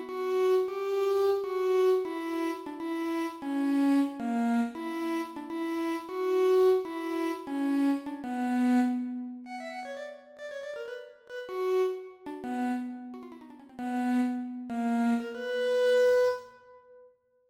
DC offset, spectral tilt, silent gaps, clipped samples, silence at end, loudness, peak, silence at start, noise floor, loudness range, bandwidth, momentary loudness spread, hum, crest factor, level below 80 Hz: under 0.1%; -5 dB/octave; none; under 0.1%; 0.45 s; -29 LUFS; -16 dBFS; 0 s; -60 dBFS; 6 LU; 16.5 kHz; 15 LU; none; 14 dB; -74 dBFS